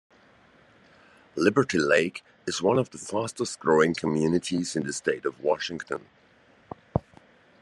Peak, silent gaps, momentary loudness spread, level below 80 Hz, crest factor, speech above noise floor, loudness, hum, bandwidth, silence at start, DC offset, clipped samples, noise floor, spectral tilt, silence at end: -6 dBFS; none; 13 LU; -58 dBFS; 22 dB; 33 dB; -26 LUFS; none; 12 kHz; 1.35 s; under 0.1%; under 0.1%; -59 dBFS; -5 dB/octave; 0.6 s